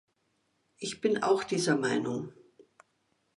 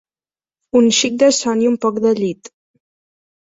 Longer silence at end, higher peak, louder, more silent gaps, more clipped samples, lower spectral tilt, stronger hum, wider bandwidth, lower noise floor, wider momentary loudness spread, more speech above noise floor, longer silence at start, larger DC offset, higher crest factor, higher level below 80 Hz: about the same, 1.05 s vs 1.15 s; second, -14 dBFS vs -2 dBFS; second, -30 LUFS vs -15 LUFS; neither; neither; about the same, -4.5 dB/octave vs -3.5 dB/octave; neither; first, 11.5 kHz vs 8 kHz; second, -75 dBFS vs under -90 dBFS; first, 12 LU vs 7 LU; second, 46 dB vs over 75 dB; about the same, 0.8 s vs 0.75 s; neither; about the same, 18 dB vs 16 dB; second, -74 dBFS vs -62 dBFS